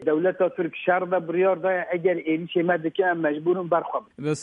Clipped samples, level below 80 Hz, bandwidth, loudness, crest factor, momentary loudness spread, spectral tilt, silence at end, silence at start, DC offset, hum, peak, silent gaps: under 0.1%; -74 dBFS; 10.5 kHz; -24 LUFS; 16 dB; 4 LU; -6.5 dB/octave; 0 s; 0 s; under 0.1%; none; -8 dBFS; none